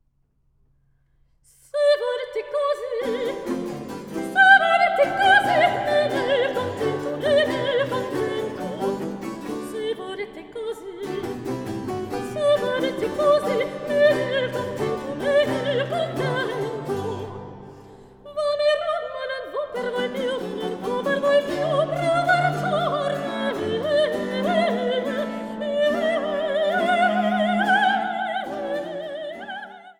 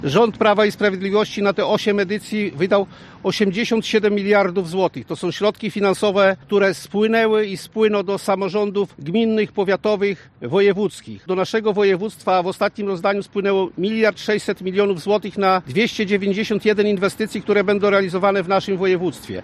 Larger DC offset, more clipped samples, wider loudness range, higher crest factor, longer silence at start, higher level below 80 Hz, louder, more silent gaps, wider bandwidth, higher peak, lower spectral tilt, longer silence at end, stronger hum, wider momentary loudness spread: neither; neither; first, 9 LU vs 2 LU; first, 20 dB vs 14 dB; first, 1.75 s vs 0 s; about the same, -58 dBFS vs -58 dBFS; second, -23 LUFS vs -19 LUFS; neither; first, 16 kHz vs 13.5 kHz; about the same, -2 dBFS vs -4 dBFS; about the same, -5 dB/octave vs -5.5 dB/octave; about the same, 0.1 s vs 0 s; neither; first, 12 LU vs 6 LU